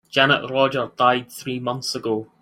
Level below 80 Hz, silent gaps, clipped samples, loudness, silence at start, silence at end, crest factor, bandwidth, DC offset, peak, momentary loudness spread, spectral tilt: -64 dBFS; none; under 0.1%; -21 LUFS; 0.15 s; 0.15 s; 20 dB; 16.5 kHz; under 0.1%; -2 dBFS; 9 LU; -4 dB/octave